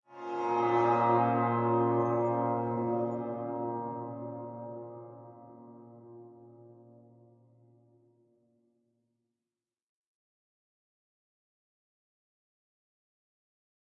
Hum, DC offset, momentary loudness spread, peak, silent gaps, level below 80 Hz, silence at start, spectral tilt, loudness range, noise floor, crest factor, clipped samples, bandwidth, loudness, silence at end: none; under 0.1%; 25 LU; -14 dBFS; none; -80 dBFS; 0.1 s; -9 dB/octave; 23 LU; under -90 dBFS; 20 dB; under 0.1%; 6.8 kHz; -30 LUFS; 7.25 s